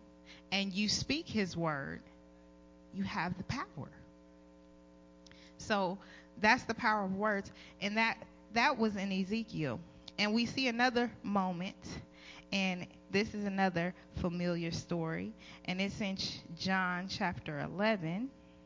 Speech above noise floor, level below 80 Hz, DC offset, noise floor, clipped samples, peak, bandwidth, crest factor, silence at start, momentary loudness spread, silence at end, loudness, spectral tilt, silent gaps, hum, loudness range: 24 dB; -60 dBFS; under 0.1%; -59 dBFS; under 0.1%; -16 dBFS; 7.6 kHz; 22 dB; 0 s; 14 LU; 0 s; -35 LUFS; -5 dB/octave; none; none; 8 LU